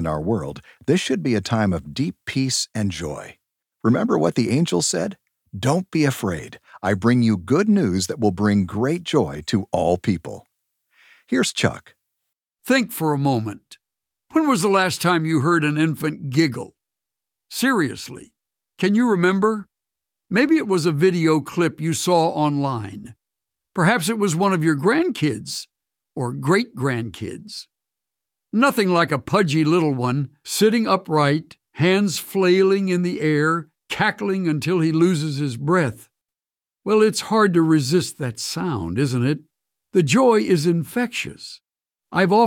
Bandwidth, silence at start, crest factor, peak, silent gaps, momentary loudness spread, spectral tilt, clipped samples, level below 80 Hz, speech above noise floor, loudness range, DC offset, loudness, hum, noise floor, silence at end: 17 kHz; 0 s; 18 dB; -4 dBFS; none; 12 LU; -5.5 dB/octave; under 0.1%; -54 dBFS; over 70 dB; 4 LU; under 0.1%; -20 LUFS; none; under -90 dBFS; 0 s